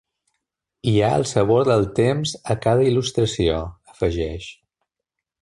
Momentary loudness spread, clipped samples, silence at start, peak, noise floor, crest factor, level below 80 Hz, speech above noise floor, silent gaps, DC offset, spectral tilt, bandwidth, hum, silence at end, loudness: 10 LU; under 0.1%; 0.85 s; -4 dBFS; -83 dBFS; 16 dB; -40 dBFS; 64 dB; none; under 0.1%; -6 dB/octave; 11.5 kHz; none; 0.9 s; -20 LUFS